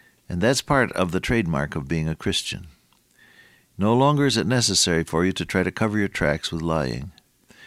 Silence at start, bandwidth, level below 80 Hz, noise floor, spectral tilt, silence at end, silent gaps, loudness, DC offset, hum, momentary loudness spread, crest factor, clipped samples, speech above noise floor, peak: 0.3 s; 15.5 kHz; -44 dBFS; -58 dBFS; -4.5 dB/octave; 0 s; none; -22 LUFS; under 0.1%; none; 8 LU; 18 dB; under 0.1%; 36 dB; -6 dBFS